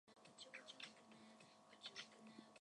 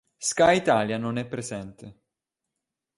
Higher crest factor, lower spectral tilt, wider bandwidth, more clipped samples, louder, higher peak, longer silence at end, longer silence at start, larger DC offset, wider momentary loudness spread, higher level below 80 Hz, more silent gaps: about the same, 22 dB vs 20 dB; second, -2 dB/octave vs -4 dB/octave; about the same, 11 kHz vs 11.5 kHz; neither; second, -59 LUFS vs -24 LUFS; second, -40 dBFS vs -8 dBFS; second, 0 s vs 1.05 s; second, 0.05 s vs 0.2 s; neither; second, 11 LU vs 16 LU; second, under -90 dBFS vs -60 dBFS; neither